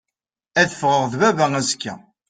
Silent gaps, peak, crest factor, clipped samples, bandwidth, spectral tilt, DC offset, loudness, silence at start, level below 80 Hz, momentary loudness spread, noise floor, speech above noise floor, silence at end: none; -2 dBFS; 18 dB; under 0.1%; 10 kHz; -3.5 dB/octave; under 0.1%; -19 LUFS; 0.55 s; -60 dBFS; 8 LU; -86 dBFS; 67 dB; 0.3 s